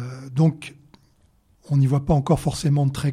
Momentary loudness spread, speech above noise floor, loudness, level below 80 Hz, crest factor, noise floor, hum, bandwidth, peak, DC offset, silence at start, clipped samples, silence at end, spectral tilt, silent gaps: 9 LU; 40 dB; -21 LUFS; -42 dBFS; 16 dB; -59 dBFS; none; 13 kHz; -6 dBFS; under 0.1%; 0 s; under 0.1%; 0 s; -7.5 dB/octave; none